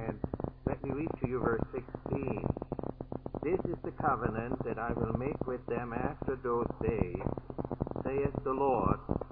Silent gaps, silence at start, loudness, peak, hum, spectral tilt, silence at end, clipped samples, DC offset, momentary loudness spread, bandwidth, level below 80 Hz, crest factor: none; 0 s; -35 LUFS; -12 dBFS; none; -9 dB/octave; 0 s; under 0.1%; under 0.1%; 7 LU; 4.7 kHz; -48 dBFS; 24 dB